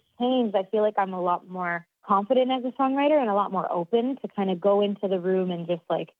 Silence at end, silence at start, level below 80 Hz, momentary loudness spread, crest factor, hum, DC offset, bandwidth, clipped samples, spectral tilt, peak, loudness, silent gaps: 0.15 s; 0.2 s; -82 dBFS; 7 LU; 16 dB; none; under 0.1%; 4.6 kHz; under 0.1%; -9 dB/octave; -10 dBFS; -25 LUFS; none